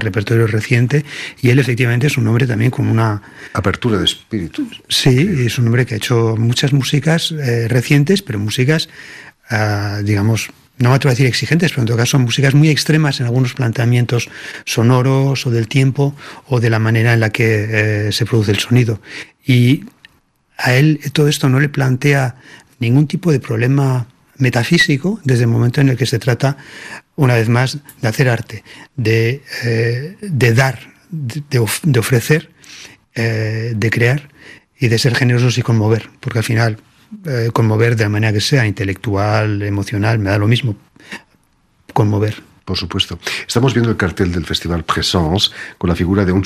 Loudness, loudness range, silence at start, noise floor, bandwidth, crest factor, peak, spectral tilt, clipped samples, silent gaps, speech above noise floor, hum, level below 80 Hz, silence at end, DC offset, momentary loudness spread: -15 LUFS; 3 LU; 0 s; -57 dBFS; 14.5 kHz; 14 dB; 0 dBFS; -5.5 dB/octave; under 0.1%; none; 42 dB; none; -44 dBFS; 0 s; under 0.1%; 10 LU